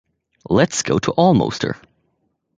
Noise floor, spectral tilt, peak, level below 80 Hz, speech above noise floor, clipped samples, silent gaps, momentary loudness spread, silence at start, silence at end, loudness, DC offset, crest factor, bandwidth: -69 dBFS; -5 dB/octave; -2 dBFS; -46 dBFS; 52 dB; under 0.1%; none; 11 LU; 0.5 s; 0.85 s; -18 LUFS; under 0.1%; 18 dB; 9.4 kHz